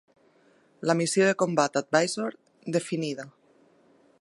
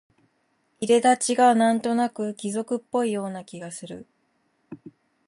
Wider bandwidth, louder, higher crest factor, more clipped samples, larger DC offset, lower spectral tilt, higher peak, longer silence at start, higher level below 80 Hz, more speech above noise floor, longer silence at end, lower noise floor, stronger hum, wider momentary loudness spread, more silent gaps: about the same, 11.5 kHz vs 11.5 kHz; second, -26 LUFS vs -23 LUFS; about the same, 22 dB vs 18 dB; neither; neither; about the same, -4.5 dB/octave vs -4 dB/octave; about the same, -6 dBFS vs -6 dBFS; about the same, 0.8 s vs 0.8 s; about the same, -78 dBFS vs -74 dBFS; second, 36 dB vs 47 dB; first, 0.9 s vs 0.4 s; second, -62 dBFS vs -69 dBFS; neither; second, 13 LU vs 22 LU; neither